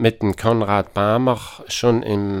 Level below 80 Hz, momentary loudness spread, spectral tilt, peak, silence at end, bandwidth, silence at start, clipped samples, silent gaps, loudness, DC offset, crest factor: -48 dBFS; 5 LU; -6 dB/octave; -2 dBFS; 0 s; 16.5 kHz; 0 s; under 0.1%; none; -19 LUFS; under 0.1%; 16 dB